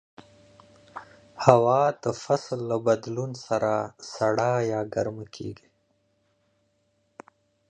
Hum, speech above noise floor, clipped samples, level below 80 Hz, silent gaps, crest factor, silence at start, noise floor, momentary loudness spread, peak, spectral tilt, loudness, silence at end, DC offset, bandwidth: none; 46 dB; under 0.1%; -64 dBFS; none; 26 dB; 0.95 s; -70 dBFS; 19 LU; 0 dBFS; -6 dB/octave; -25 LUFS; 2.15 s; under 0.1%; 9.6 kHz